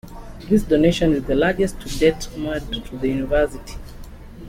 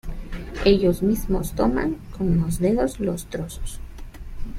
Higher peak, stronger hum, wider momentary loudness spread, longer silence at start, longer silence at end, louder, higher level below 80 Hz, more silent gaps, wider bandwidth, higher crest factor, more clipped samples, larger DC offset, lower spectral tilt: about the same, -4 dBFS vs -4 dBFS; neither; about the same, 21 LU vs 20 LU; about the same, 0.05 s vs 0.05 s; about the same, 0 s vs 0 s; first, -20 LUFS vs -23 LUFS; about the same, -34 dBFS vs -32 dBFS; neither; about the same, 16.5 kHz vs 16 kHz; about the same, 16 dB vs 18 dB; neither; neither; about the same, -6 dB/octave vs -6.5 dB/octave